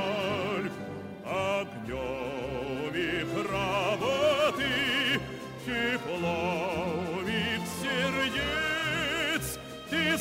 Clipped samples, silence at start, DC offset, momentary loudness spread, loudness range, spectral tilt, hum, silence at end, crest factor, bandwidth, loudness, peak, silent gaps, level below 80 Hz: under 0.1%; 0 s; under 0.1%; 9 LU; 4 LU; -4 dB/octave; none; 0 s; 14 dB; 16 kHz; -30 LUFS; -16 dBFS; none; -52 dBFS